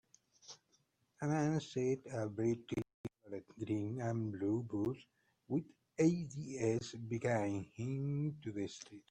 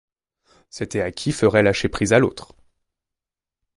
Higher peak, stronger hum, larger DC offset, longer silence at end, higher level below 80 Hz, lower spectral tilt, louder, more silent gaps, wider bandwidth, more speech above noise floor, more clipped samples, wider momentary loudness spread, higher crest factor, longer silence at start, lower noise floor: second, -20 dBFS vs -2 dBFS; neither; neither; second, 0.1 s vs 1.35 s; second, -72 dBFS vs -46 dBFS; first, -7 dB/octave vs -5.5 dB/octave; second, -39 LUFS vs -20 LUFS; first, 2.94-3.04 s vs none; second, 9.8 kHz vs 11.5 kHz; second, 39 dB vs 69 dB; neither; about the same, 15 LU vs 16 LU; about the same, 20 dB vs 20 dB; second, 0.45 s vs 0.75 s; second, -77 dBFS vs -88 dBFS